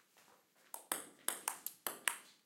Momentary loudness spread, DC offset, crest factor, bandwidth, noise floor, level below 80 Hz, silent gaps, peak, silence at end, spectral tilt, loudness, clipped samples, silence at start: 8 LU; under 0.1%; 36 dB; 16.5 kHz; -69 dBFS; under -90 dBFS; none; -10 dBFS; 0.1 s; 1 dB/octave; -41 LUFS; under 0.1%; 0.15 s